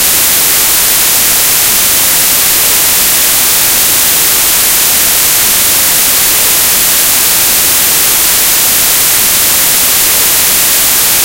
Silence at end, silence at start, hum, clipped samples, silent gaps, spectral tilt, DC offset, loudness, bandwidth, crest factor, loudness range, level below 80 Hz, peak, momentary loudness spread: 0 s; 0 s; none; 1%; none; 0.5 dB/octave; under 0.1%; -5 LUFS; over 20 kHz; 8 dB; 0 LU; -36 dBFS; 0 dBFS; 0 LU